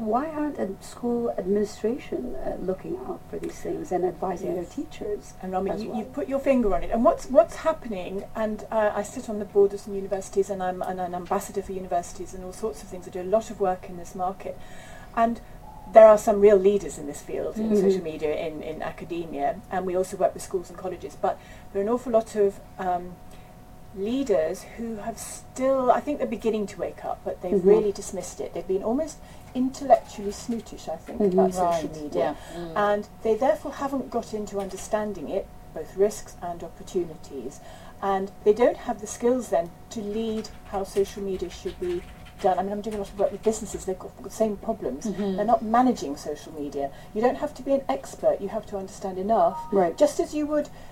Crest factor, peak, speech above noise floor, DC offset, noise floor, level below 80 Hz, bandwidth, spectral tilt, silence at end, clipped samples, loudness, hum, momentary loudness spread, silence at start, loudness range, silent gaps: 24 dB; -2 dBFS; 20 dB; under 0.1%; -45 dBFS; -46 dBFS; 16 kHz; -6 dB/octave; 0 s; under 0.1%; -26 LUFS; none; 14 LU; 0 s; 9 LU; none